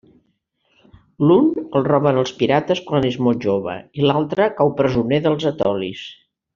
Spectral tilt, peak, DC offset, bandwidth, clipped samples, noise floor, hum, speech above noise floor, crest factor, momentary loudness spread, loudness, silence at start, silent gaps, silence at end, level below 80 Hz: -5.5 dB/octave; -2 dBFS; under 0.1%; 7.4 kHz; under 0.1%; -67 dBFS; none; 49 dB; 16 dB; 7 LU; -18 LUFS; 1.2 s; none; 0.4 s; -52 dBFS